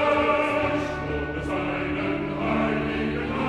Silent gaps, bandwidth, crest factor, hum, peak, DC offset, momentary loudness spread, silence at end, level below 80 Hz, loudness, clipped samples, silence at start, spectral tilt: none; 10.5 kHz; 16 dB; none; -10 dBFS; under 0.1%; 7 LU; 0 s; -42 dBFS; -25 LUFS; under 0.1%; 0 s; -7 dB/octave